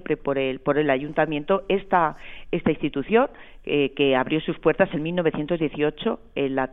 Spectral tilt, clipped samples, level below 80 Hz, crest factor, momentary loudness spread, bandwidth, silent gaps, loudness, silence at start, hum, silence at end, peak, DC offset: -9 dB/octave; under 0.1%; -48 dBFS; 18 dB; 6 LU; 4 kHz; none; -23 LUFS; 0.05 s; none; 0 s; -4 dBFS; under 0.1%